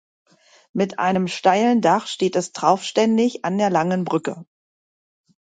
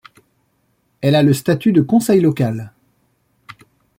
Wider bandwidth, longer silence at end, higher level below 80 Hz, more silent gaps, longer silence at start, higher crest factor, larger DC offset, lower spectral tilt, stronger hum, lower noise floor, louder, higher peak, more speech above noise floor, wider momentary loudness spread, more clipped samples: second, 9.4 kHz vs 16.5 kHz; second, 1 s vs 1.3 s; second, -68 dBFS vs -56 dBFS; neither; second, 0.75 s vs 1 s; about the same, 18 dB vs 16 dB; neither; second, -5.5 dB/octave vs -7 dB/octave; neither; first, under -90 dBFS vs -64 dBFS; second, -20 LUFS vs -15 LUFS; about the same, -2 dBFS vs -2 dBFS; first, over 71 dB vs 49 dB; about the same, 8 LU vs 9 LU; neither